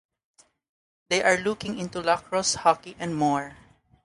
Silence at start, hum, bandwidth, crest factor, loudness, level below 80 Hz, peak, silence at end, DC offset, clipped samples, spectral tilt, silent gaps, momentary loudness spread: 1.1 s; none; 11.5 kHz; 22 dB; -25 LUFS; -60 dBFS; -4 dBFS; 0.5 s; under 0.1%; under 0.1%; -3 dB/octave; none; 10 LU